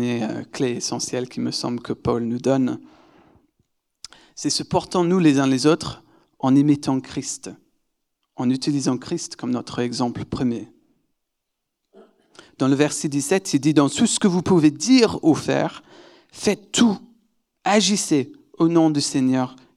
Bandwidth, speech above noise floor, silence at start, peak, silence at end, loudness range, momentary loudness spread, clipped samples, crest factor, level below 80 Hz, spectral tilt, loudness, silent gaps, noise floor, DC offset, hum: 13 kHz; 59 dB; 0 s; -4 dBFS; 0.25 s; 7 LU; 11 LU; under 0.1%; 18 dB; -58 dBFS; -5 dB/octave; -21 LUFS; none; -79 dBFS; under 0.1%; none